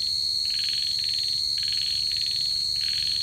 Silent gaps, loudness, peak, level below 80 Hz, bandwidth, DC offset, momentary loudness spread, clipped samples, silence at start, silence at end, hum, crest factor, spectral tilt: none; -23 LUFS; -14 dBFS; -54 dBFS; 16.5 kHz; under 0.1%; 0 LU; under 0.1%; 0 s; 0 s; none; 12 dB; 1 dB/octave